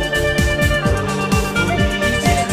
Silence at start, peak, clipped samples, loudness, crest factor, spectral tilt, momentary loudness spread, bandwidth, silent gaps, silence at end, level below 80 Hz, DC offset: 0 s; -2 dBFS; under 0.1%; -17 LUFS; 14 dB; -4.5 dB/octave; 2 LU; 16 kHz; none; 0 s; -24 dBFS; under 0.1%